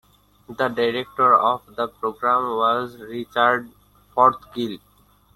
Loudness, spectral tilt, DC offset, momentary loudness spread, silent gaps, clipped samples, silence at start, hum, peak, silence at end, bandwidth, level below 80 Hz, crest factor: -21 LUFS; -5.5 dB/octave; under 0.1%; 13 LU; none; under 0.1%; 0.5 s; none; -2 dBFS; 0.6 s; 15.5 kHz; -60 dBFS; 20 dB